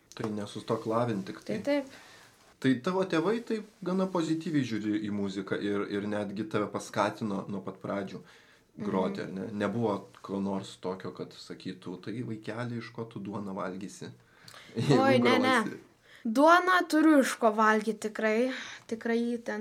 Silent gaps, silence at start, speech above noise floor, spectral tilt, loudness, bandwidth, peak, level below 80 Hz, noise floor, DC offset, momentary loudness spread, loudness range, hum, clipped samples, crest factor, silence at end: none; 0.15 s; 23 dB; -5.5 dB/octave; -30 LUFS; 15.5 kHz; -8 dBFS; -76 dBFS; -52 dBFS; under 0.1%; 17 LU; 13 LU; none; under 0.1%; 22 dB; 0 s